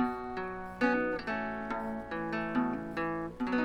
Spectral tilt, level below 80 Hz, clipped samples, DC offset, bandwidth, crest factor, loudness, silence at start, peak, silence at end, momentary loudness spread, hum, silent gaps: -7 dB/octave; -56 dBFS; under 0.1%; under 0.1%; 9 kHz; 18 dB; -34 LUFS; 0 s; -16 dBFS; 0 s; 7 LU; none; none